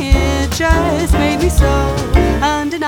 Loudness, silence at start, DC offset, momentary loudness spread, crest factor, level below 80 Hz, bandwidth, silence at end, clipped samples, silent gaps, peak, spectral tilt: -14 LUFS; 0 s; under 0.1%; 3 LU; 12 dB; -16 dBFS; 17.5 kHz; 0 s; under 0.1%; none; 0 dBFS; -5.5 dB/octave